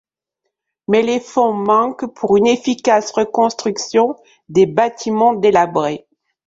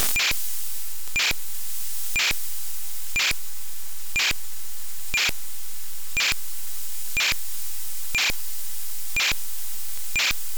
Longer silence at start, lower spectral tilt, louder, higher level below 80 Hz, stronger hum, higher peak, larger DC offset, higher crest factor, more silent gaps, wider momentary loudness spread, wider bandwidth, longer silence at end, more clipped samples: first, 0.9 s vs 0 s; first, -5 dB/octave vs 0.5 dB/octave; first, -16 LUFS vs -25 LUFS; second, -58 dBFS vs -44 dBFS; neither; first, -2 dBFS vs -8 dBFS; second, under 0.1% vs 6%; second, 14 dB vs 20 dB; neither; second, 8 LU vs 12 LU; second, 7.8 kHz vs over 20 kHz; first, 0.5 s vs 0 s; neither